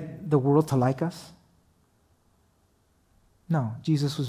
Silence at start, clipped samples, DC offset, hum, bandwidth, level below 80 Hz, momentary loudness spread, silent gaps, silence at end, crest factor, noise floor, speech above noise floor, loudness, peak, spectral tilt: 0 s; under 0.1%; under 0.1%; none; 15 kHz; -62 dBFS; 9 LU; none; 0 s; 18 dB; -66 dBFS; 41 dB; -26 LUFS; -10 dBFS; -7.5 dB/octave